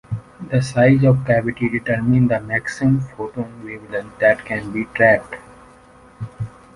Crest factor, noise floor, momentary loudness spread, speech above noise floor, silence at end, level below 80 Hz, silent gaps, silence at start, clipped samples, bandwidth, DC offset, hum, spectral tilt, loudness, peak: 16 dB; -47 dBFS; 16 LU; 29 dB; 0.25 s; -46 dBFS; none; 0.1 s; under 0.1%; 11.5 kHz; under 0.1%; none; -8 dB/octave; -18 LUFS; -2 dBFS